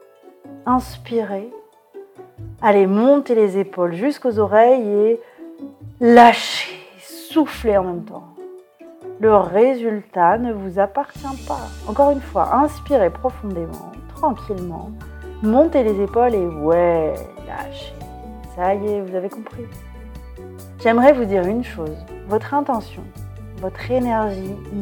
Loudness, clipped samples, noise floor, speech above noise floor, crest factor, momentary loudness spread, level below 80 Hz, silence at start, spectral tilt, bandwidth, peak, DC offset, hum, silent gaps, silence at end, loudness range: -18 LUFS; under 0.1%; -44 dBFS; 27 dB; 18 dB; 23 LU; -40 dBFS; 0.45 s; -6.5 dB/octave; 18.5 kHz; 0 dBFS; under 0.1%; none; none; 0 s; 7 LU